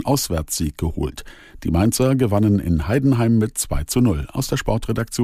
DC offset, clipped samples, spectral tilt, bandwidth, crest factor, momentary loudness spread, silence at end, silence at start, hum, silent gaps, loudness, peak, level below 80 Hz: under 0.1%; under 0.1%; -6 dB/octave; 15.5 kHz; 14 dB; 7 LU; 0 s; 0 s; none; none; -20 LUFS; -4 dBFS; -32 dBFS